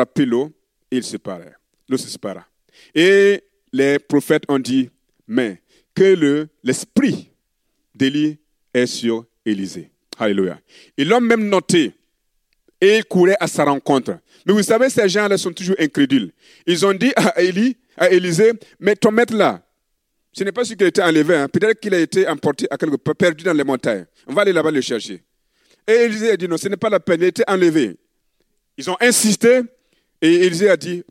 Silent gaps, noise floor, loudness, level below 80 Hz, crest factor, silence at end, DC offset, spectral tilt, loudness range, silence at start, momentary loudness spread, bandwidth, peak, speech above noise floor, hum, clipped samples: none; -70 dBFS; -17 LUFS; -66 dBFS; 16 dB; 0.1 s; under 0.1%; -4.5 dB/octave; 3 LU; 0 s; 12 LU; 16 kHz; -2 dBFS; 54 dB; none; under 0.1%